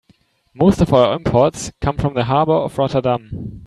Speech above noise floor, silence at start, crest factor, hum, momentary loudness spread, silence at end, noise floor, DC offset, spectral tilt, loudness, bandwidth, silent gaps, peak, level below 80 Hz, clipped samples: 41 dB; 0.55 s; 16 dB; none; 9 LU; 0 s; -57 dBFS; under 0.1%; -6.5 dB/octave; -17 LUFS; 13 kHz; none; 0 dBFS; -36 dBFS; under 0.1%